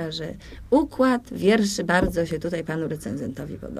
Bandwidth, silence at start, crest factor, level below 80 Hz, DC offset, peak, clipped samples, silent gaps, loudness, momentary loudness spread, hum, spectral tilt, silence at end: 15.5 kHz; 0 s; 20 dB; -42 dBFS; under 0.1%; -4 dBFS; under 0.1%; none; -24 LUFS; 12 LU; none; -5.5 dB/octave; 0 s